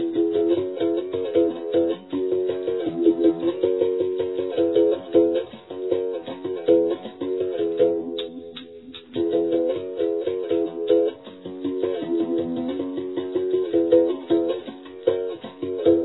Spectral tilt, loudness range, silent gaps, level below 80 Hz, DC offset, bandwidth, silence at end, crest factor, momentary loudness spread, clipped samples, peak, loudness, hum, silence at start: -10 dB/octave; 3 LU; none; -64 dBFS; under 0.1%; 4.1 kHz; 0 s; 18 dB; 11 LU; under 0.1%; -6 dBFS; -23 LUFS; none; 0 s